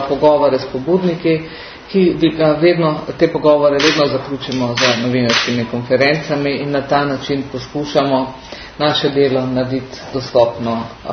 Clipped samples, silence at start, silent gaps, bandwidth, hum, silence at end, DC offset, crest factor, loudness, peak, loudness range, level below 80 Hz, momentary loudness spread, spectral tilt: under 0.1%; 0 s; none; 6.6 kHz; none; 0 s; under 0.1%; 16 dB; -15 LUFS; 0 dBFS; 3 LU; -46 dBFS; 10 LU; -5.5 dB/octave